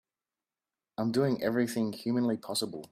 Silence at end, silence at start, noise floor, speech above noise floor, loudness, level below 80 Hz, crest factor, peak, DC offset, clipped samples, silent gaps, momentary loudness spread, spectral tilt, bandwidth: 0.05 s; 1 s; under -90 dBFS; over 60 dB; -31 LUFS; -72 dBFS; 18 dB; -14 dBFS; under 0.1%; under 0.1%; none; 5 LU; -5.5 dB/octave; 15.5 kHz